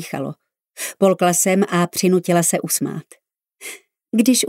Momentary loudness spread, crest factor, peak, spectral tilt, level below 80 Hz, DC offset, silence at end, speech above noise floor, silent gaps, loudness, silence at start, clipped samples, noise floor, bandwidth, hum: 18 LU; 16 dB; -2 dBFS; -4 dB/octave; -70 dBFS; under 0.1%; 0 s; 22 dB; none; -18 LUFS; 0 s; under 0.1%; -39 dBFS; 16.5 kHz; none